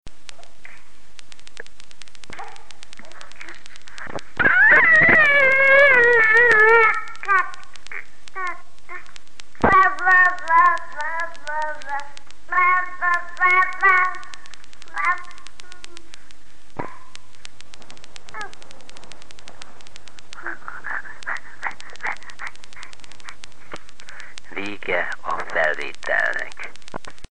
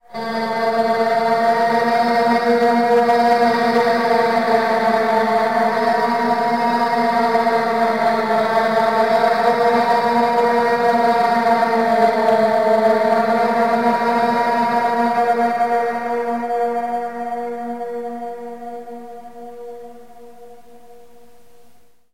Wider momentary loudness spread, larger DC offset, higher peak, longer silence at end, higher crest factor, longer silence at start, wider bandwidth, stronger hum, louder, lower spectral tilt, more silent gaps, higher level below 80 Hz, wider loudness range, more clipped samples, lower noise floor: first, 26 LU vs 12 LU; first, 6% vs 0.6%; about the same, -4 dBFS vs -4 dBFS; second, 0 s vs 1.6 s; first, 20 dB vs 14 dB; second, 0 s vs 0.15 s; second, 10 kHz vs 16 kHz; neither; about the same, -17 LUFS vs -17 LUFS; second, -3.5 dB/octave vs -5 dB/octave; neither; first, -52 dBFS vs -62 dBFS; first, 22 LU vs 12 LU; neither; about the same, -52 dBFS vs -52 dBFS